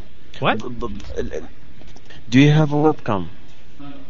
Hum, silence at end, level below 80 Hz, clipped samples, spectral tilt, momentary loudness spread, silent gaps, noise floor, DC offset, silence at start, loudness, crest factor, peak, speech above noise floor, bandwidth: none; 0.05 s; -40 dBFS; under 0.1%; -7 dB/octave; 18 LU; none; -40 dBFS; 7%; 0 s; -19 LUFS; 20 dB; -2 dBFS; 21 dB; 7.2 kHz